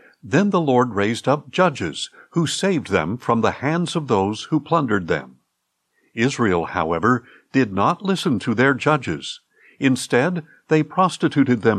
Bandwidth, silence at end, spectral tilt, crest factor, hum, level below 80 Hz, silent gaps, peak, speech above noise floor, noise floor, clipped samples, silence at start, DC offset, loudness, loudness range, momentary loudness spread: 13 kHz; 0 s; -5.5 dB/octave; 16 dB; none; -60 dBFS; none; -4 dBFS; 54 dB; -74 dBFS; under 0.1%; 0.25 s; under 0.1%; -20 LUFS; 2 LU; 8 LU